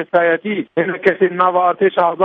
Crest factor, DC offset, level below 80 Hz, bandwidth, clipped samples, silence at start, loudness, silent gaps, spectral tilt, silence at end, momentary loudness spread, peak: 16 dB; under 0.1%; -64 dBFS; 4.7 kHz; under 0.1%; 0 s; -16 LUFS; none; -8 dB/octave; 0 s; 5 LU; 0 dBFS